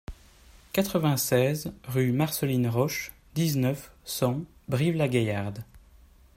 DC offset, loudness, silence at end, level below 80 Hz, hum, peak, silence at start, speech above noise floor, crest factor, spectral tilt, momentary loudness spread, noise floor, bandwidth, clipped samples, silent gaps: under 0.1%; -27 LUFS; 0.6 s; -54 dBFS; none; -10 dBFS; 0.1 s; 29 dB; 18 dB; -5.5 dB/octave; 11 LU; -55 dBFS; 16 kHz; under 0.1%; none